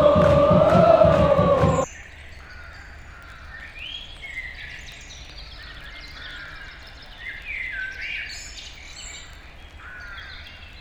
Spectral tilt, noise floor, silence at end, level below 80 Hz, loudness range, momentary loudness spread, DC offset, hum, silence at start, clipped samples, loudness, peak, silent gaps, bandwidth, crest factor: -6.5 dB/octave; -42 dBFS; 0 s; -40 dBFS; 17 LU; 26 LU; under 0.1%; none; 0 s; under 0.1%; -20 LUFS; -2 dBFS; none; 10.5 kHz; 20 dB